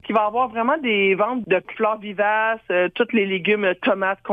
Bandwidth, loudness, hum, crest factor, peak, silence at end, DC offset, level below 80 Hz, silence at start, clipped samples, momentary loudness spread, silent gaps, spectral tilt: 4.8 kHz; -20 LUFS; none; 14 dB; -6 dBFS; 0 s; under 0.1%; -64 dBFS; 0.05 s; under 0.1%; 4 LU; none; -7.5 dB/octave